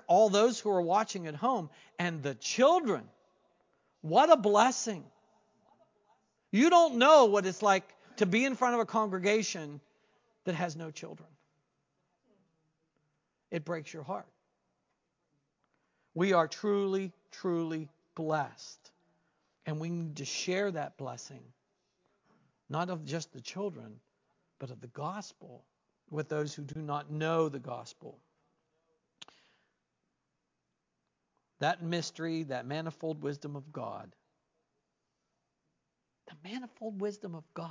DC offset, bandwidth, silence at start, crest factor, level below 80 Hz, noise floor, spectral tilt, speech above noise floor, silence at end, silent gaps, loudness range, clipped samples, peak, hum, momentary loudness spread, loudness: under 0.1%; 7.6 kHz; 0.1 s; 24 dB; -84 dBFS; -84 dBFS; -4.5 dB/octave; 53 dB; 0 s; none; 18 LU; under 0.1%; -8 dBFS; none; 20 LU; -30 LUFS